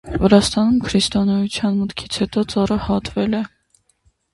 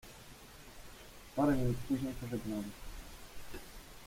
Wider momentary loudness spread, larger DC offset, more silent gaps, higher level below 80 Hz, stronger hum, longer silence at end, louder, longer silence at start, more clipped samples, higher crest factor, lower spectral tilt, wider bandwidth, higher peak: second, 9 LU vs 21 LU; neither; neither; first, -38 dBFS vs -52 dBFS; neither; first, 0.85 s vs 0 s; first, -18 LUFS vs -36 LUFS; about the same, 0.05 s vs 0.05 s; neither; about the same, 18 dB vs 18 dB; about the same, -5.5 dB/octave vs -6.5 dB/octave; second, 11.5 kHz vs 16.5 kHz; first, 0 dBFS vs -20 dBFS